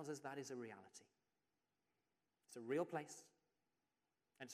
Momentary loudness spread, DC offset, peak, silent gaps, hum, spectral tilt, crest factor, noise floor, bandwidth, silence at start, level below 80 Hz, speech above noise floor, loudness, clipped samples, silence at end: 17 LU; under 0.1%; -30 dBFS; none; none; -4.5 dB/octave; 22 dB; under -90 dBFS; 13.5 kHz; 0 s; under -90 dBFS; over 41 dB; -49 LUFS; under 0.1%; 0 s